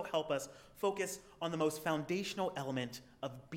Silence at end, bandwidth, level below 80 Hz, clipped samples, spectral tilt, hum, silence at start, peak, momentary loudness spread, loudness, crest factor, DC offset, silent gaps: 0 s; 17.5 kHz; -72 dBFS; under 0.1%; -4.5 dB/octave; none; 0 s; -20 dBFS; 10 LU; -39 LUFS; 18 dB; under 0.1%; none